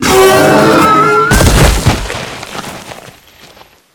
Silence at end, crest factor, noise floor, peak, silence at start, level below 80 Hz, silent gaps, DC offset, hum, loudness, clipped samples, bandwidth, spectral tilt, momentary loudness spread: 0.85 s; 10 dB; -40 dBFS; 0 dBFS; 0 s; -20 dBFS; none; under 0.1%; none; -7 LUFS; 0.8%; 20 kHz; -4.5 dB/octave; 18 LU